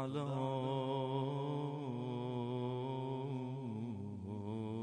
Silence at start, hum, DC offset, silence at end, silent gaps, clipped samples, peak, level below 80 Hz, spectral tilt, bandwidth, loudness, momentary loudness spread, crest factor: 0 s; none; under 0.1%; 0 s; none; under 0.1%; -26 dBFS; -78 dBFS; -8.5 dB/octave; 9.4 kHz; -41 LUFS; 6 LU; 14 dB